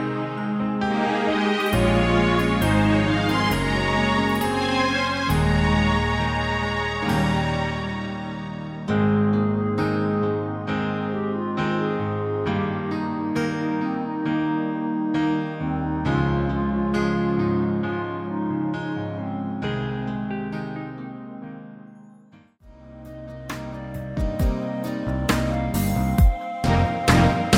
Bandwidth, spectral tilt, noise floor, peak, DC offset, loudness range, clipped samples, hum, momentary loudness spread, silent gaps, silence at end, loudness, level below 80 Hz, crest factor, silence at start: 16 kHz; -6.5 dB/octave; -51 dBFS; -4 dBFS; under 0.1%; 10 LU; under 0.1%; none; 11 LU; none; 0 s; -23 LUFS; -34 dBFS; 20 dB; 0 s